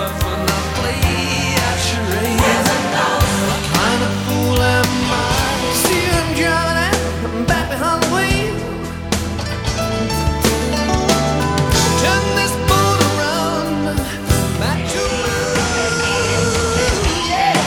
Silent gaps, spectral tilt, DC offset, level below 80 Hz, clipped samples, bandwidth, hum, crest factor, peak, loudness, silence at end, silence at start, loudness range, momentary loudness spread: none; -4 dB/octave; under 0.1%; -28 dBFS; under 0.1%; 20 kHz; none; 16 dB; -2 dBFS; -16 LUFS; 0 s; 0 s; 3 LU; 5 LU